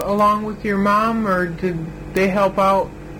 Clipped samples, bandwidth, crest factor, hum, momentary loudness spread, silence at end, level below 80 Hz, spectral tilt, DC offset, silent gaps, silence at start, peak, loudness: under 0.1%; 16.5 kHz; 16 dB; none; 8 LU; 0 s; -40 dBFS; -6.5 dB/octave; under 0.1%; none; 0 s; -2 dBFS; -19 LUFS